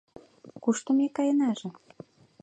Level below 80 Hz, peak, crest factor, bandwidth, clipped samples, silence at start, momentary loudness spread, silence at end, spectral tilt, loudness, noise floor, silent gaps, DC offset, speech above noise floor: -76 dBFS; -12 dBFS; 16 dB; 9 kHz; under 0.1%; 0.45 s; 10 LU; 0.7 s; -5 dB/octave; -27 LUFS; -51 dBFS; none; under 0.1%; 25 dB